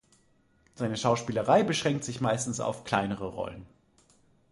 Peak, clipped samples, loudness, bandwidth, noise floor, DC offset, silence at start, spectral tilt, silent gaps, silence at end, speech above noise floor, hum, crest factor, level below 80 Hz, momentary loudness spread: -8 dBFS; under 0.1%; -29 LUFS; 11.5 kHz; -66 dBFS; under 0.1%; 0.8 s; -5 dB/octave; none; 0.85 s; 37 dB; none; 22 dB; -60 dBFS; 12 LU